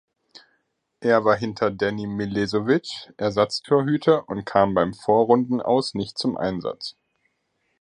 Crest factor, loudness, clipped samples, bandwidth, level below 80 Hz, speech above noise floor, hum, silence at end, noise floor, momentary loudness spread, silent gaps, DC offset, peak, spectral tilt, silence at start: 20 dB; -22 LUFS; under 0.1%; 10.5 kHz; -56 dBFS; 50 dB; none; 0.9 s; -72 dBFS; 9 LU; none; under 0.1%; -2 dBFS; -6 dB/octave; 1 s